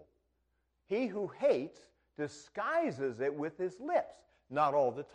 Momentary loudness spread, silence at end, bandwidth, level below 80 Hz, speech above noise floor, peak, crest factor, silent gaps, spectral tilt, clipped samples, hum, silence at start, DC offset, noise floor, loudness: 11 LU; 0.1 s; 9.8 kHz; -76 dBFS; 45 dB; -16 dBFS; 20 dB; none; -6 dB/octave; under 0.1%; none; 0.9 s; under 0.1%; -79 dBFS; -35 LUFS